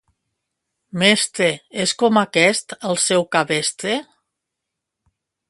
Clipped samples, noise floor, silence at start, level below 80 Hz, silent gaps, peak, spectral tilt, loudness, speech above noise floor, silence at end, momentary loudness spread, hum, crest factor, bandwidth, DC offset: under 0.1%; -81 dBFS; 0.95 s; -66 dBFS; none; 0 dBFS; -3 dB/octave; -18 LUFS; 63 dB; 1.45 s; 9 LU; none; 20 dB; 11.5 kHz; under 0.1%